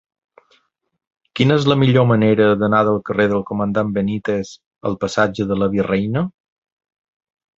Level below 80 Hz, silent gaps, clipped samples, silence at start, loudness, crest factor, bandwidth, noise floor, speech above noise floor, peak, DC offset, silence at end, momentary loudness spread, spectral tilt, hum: -50 dBFS; 4.66-4.71 s; under 0.1%; 1.35 s; -17 LUFS; 18 dB; 7.8 kHz; -60 dBFS; 44 dB; -2 dBFS; under 0.1%; 1.3 s; 10 LU; -7 dB/octave; none